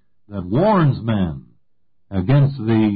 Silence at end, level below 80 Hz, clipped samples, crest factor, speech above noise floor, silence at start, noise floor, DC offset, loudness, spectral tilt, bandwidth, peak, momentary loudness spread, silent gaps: 0 s; -42 dBFS; under 0.1%; 12 dB; 53 dB; 0.3 s; -70 dBFS; under 0.1%; -18 LUFS; -13.5 dB/octave; 4.8 kHz; -8 dBFS; 15 LU; none